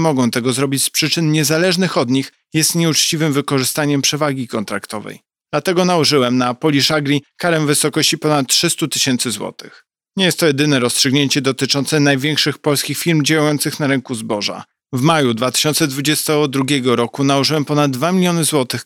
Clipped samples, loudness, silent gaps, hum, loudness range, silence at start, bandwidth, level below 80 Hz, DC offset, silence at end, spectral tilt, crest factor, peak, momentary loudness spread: under 0.1%; -15 LUFS; none; none; 2 LU; 0 s; 19 kHz; -62 dBFS; under 0.1%; 0 s; -4 dB/octave; 14 dB; -2 dBFS; 7 LU